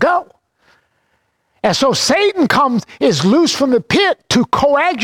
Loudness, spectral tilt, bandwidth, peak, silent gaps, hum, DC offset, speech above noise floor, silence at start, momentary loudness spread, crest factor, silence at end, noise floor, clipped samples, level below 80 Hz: -14 LUFS; -4 dB/octave; 17.5 kHz; -2 dBFS; none; none; under 0.1%; 50 dB; 0 s; 4 LU; 12 dB; 0 s; -63 dBFS; under 0.1%; -48 dBFS